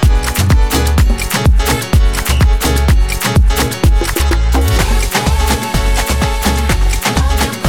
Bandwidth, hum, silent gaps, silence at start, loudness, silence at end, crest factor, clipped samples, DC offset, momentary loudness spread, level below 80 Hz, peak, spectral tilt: 18.5 kHz; none; none; 0 s; -13 LUFS; 0 s; 10 dB; under 0.1%; under 0.1%; 2 LU; -12 dBFS; 0 dBFS; -4.5 dB/octave